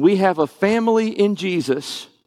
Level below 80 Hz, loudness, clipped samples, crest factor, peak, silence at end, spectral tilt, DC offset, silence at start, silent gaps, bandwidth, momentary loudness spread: -64 dBFS; -19 LUFS; under 0.1%; 16 dB; -2 dBFS; 0.2 s; -6 dB/octave; under 0.1%; 0 s; none; 14 kHz; 7 LU